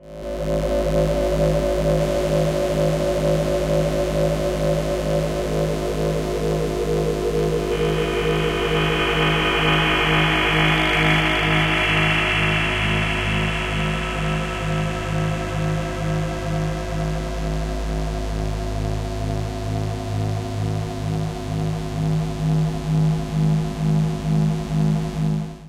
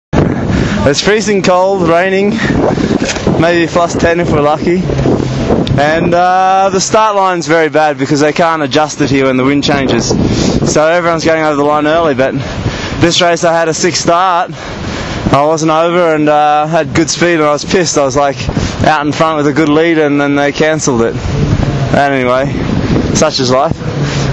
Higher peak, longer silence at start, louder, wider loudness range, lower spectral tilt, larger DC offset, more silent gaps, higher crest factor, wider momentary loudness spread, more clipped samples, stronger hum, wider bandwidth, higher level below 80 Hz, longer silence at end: second, -6 dBFS vs 0 dBFS; second, 0 s vs 0.15 s; second, -21 LUFS vs -10 LUFS; first, 8 LU vs 1 LU; about the same, -6 dB/octave vs -5 dB/octave; neither; neither; about the same, 14 dB vs 10 dB; first, 9 LU vs 4 LU; neither; neither; first, 15.5 kHz vs 8.6 kHz; about the same, -30 dBFS vs -28 dBFS; about the same, 0 s vs 0 s